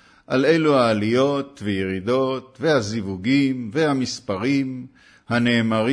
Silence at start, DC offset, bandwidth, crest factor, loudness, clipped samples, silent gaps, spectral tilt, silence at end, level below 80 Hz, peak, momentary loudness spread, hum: 0.3 s; under 0.1%; 10.5 kHz; 16 dB; -21 LUFS; under 0.1%; none; -6 dB/octave; 0 s; -60 dBFS; -6 dBFS; 8 LU; none